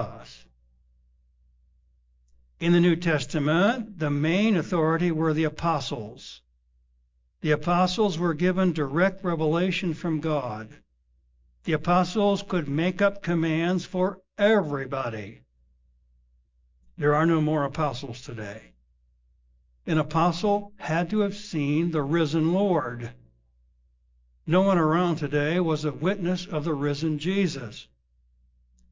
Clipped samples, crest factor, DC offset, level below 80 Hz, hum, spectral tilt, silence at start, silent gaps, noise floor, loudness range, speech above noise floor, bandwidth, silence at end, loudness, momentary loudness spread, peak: under 0.1%; 16 dB; under 0.1%; -56 dBFS; 60 Hz at -50 dBFS; -7 dB/octave; 0 s; none; -67 dBFS; 4 LU; 42 dB; 7.6 kHz; 1.1 s; -25 LUFS; 14 LU; -10 dBFS